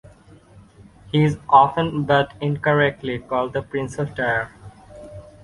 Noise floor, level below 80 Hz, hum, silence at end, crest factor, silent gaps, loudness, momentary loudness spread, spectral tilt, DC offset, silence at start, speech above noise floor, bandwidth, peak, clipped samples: -48 dBFS; -50 dBFS; none; 0.2 s; 20 dB; none; -20 LUFS; 15 LU; -7 dB/octave; under 0.1%; 0.55 s; 28 dB; 11 kHz; -2 dBFS; under 0.1%